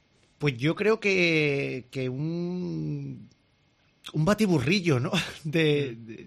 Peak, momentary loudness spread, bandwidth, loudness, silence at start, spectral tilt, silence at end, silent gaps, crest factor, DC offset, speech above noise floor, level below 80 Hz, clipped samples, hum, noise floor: -10 dBFS; 12 LU; 13 kHz; -26 LUFS; 0.4 s; -6 dB/octave; 0 s; none; 18 dB; under 0.1%; 40 dB; -58 dBFS; under 0.1%; none; -66 dBFS